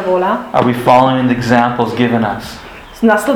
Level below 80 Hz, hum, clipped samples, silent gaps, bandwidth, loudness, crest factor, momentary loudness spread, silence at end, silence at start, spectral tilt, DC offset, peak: -42 dBFS; none; 0.3%; none; 17 kHz; -13 LUFS; 12 dB; 15 LU; 0 s; 0 s; -6.5 dB/octave; under 0.1%; 0 dBFS